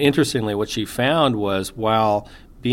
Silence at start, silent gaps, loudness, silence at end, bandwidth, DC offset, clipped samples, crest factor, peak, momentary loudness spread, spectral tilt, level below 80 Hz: 0 s; none; -20 LUFS; 0 s; 16.5 kHz; under 0.1%; under 0.1%; 18 dB; -2 dBFS; 7 LU; -5 dB/octave; -46 dBFS